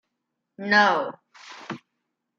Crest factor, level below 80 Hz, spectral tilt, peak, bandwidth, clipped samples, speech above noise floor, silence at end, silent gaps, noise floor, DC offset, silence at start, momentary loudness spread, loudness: 22 dB; -82 dBFS; -4 dB/octave; -4 dBFS; 7.6 kHz; under 0.1%; 57 dB; 0.6 s; none; -81 dBFS; under 0.1%; 0.6 s; 23 LU; -20 LUFS